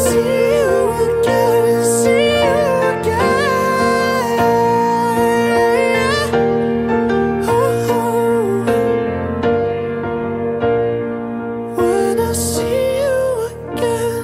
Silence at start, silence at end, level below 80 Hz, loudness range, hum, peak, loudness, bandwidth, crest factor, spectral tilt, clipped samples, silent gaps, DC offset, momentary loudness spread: 0 s; 0 s; -40 dBFS; 4 LU; none; -4 dBFS; -16 LUFS; 16 kHz; 12 dB; -5 dB/octave; under 0.1%; none; under 0.1%; 7 LU